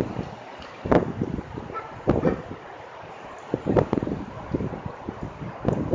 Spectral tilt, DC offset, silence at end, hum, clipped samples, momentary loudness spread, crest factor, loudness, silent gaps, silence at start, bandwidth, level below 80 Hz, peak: -8.5 dB/octave; under 0.1%; 0 s; none; under 0.1%; 17 LU; 28 dB; -28 LUFS; none; 0 s; 7.6 kHz; -42 dBFS; 0 dBFS